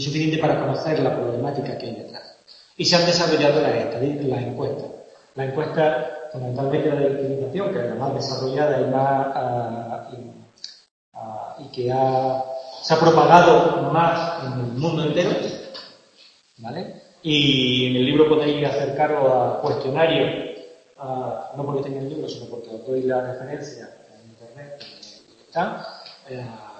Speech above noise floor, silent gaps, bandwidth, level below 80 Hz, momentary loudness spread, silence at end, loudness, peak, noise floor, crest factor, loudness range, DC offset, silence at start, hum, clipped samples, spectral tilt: 33 dB; 10.91-11.12 s; 8.6 kHz; -58 dBFS; 21 LU; 0 s; -21 LUFS; 0 dBFS; -53 dBFS; 22 dB; 11 LU; under 0.1%; 0 s; none; under 0.1%; -5.5 dB/octave